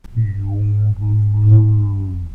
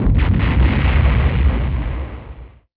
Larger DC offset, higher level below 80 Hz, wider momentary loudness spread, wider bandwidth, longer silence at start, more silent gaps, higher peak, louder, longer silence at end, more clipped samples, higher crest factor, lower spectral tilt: neither; second, -32 dBFS vs -18 dBFS; second, 9 LU vs 15 LU; second, 2.1 kHz vs 4.7 kHz; about the same, 0.1 s vs 0 s; neither; about the same, -2 dBFS vs -4 dBFS; about the same, -16 LUFS vs -17 LUFS; second, 0 s vs 0.3 s; neither; about the same, 12 dB vs 12 dB; about the same, -11.5 dB/octave vs -10.5 dB/octave